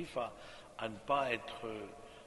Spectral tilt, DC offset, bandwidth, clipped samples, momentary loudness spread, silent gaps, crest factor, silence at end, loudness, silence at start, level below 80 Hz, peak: -4.5 dB/octave; under 0.1%; 11.5 kHz; under 0.1%; 17 LU; none; 22 dB; 0 s; -39 LUFS; 0 s; -66 dBFS; -20 dBFS